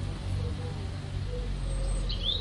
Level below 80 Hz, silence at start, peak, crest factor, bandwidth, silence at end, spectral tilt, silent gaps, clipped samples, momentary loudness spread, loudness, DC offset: -34 dBFS; 0 s; -18 dBFS; 14 dB; 11 kHz; 0 s; -5 dB/octave; none; under 0.1%; 5 LU; -34 LUFS; under 0.1%